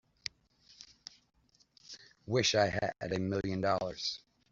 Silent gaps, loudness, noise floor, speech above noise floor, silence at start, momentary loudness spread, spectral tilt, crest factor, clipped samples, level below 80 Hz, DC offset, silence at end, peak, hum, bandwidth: none; -33 LUFS; -67 dBFS; 34 dB; 0.8 s; 23 LU; -3.5 dB/octave; 22 dB; under 0.1%; -64 dBFS; under 0.1%; 0.35 s; -14 dBFS; none; 7.8 kHz